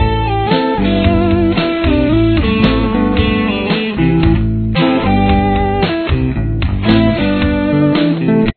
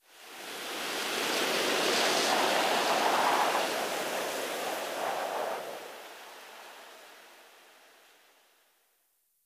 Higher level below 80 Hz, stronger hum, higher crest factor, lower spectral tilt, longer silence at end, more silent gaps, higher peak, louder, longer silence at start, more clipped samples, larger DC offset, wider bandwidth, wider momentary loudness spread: first, -22 dBFS vs -78 dBFS; neither; second, 12 dB vs 18 dB; first, -10 dB/octave vs -1 dB/octave; second, 0.05 s vs 2.05 s; neither; first, 0 dBFS vs -14 dBFS; first, -13 LUFS vs -29 LUFS; second, 0 s vs 0.15 s; neither; neither; second, 5.4 kHz vs 15.5 kHz; second, 4 LU vs 21 LU